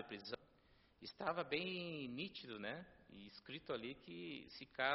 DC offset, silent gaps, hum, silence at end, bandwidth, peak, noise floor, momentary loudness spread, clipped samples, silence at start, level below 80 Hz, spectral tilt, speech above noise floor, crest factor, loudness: under 0.1%; none; none; 0 s; 5.8 kHz; -22 dBFS; -72 dBFS; 15 LU; under 0.1%; 0 s; -78 dBFS; -2 dB/octave; 25 dB; 26 dB; -47 LUFS